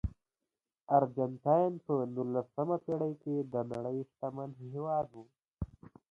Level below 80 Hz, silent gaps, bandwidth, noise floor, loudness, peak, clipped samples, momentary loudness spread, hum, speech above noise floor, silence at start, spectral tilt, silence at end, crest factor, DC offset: -54 dBFS; 5.54-5.58 s; 7.6 kHz; under -90 dBFS; -34 LUFS; -14 dBFS; under 0.1%; 14 LU; none; over 56 dB; 0.05 s; -11 dB/octave; 0.25 s; 22 dB; under 0.1%